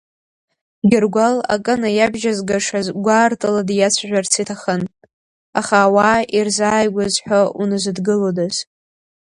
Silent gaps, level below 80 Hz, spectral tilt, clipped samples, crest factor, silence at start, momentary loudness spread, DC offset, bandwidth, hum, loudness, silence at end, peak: 5.13-5.53 s; -54 dBFS; -4 dB/octave; under 0.1%; 16 dB; 0.85 s; 7 LU; under 0.1%; 11.5 kHz; none; -17 LUFS; 0.75 s; 0 dBFS